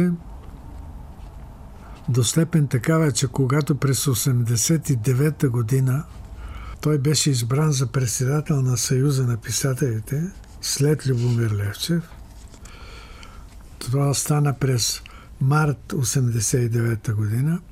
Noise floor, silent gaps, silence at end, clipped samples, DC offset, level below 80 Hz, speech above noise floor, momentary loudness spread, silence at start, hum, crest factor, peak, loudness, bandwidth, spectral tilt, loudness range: -41 dBFS; none; 0 s; under 0.1%; under 0.1%; -44 dBFS; 20 dB; 21 LU; 0 s; none; 16 dB; -6 dBFS; -21 LUFS; 16 kHz; -5 dB/octave; 5 LU